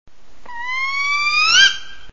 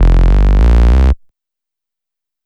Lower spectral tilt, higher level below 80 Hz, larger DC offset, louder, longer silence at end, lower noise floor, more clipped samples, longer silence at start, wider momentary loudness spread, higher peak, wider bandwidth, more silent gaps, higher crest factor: second, 2.5 dB/octave vs -8.5 dB/octave; second, -50 dBFS vs -10 dBFS; first, 3% vs under 0.1%; second, -14 LUFS vs -11 LUFS; second, 0.15 s vs 1.3 s; second, -38 dBFS vs -85 dBFS; neither; about the same, 0.05 s vs 0 s; first, 17 LU vs 5 LU; about the same, 0 dBFS vs 0 dBFS; first, 7.6 kHz vs 5.8 kHz; neither; first, 18 dB vs 10 dB